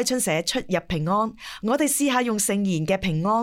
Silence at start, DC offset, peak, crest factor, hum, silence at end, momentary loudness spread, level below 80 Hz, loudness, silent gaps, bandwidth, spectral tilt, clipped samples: 0 s; under 0.1%; -8 dBFS; 14 dB; none; 0 s; 5 LU; -50 dBFS; -23 LUFS; none; 19 kHz; -4 dB/octave; under 0.1%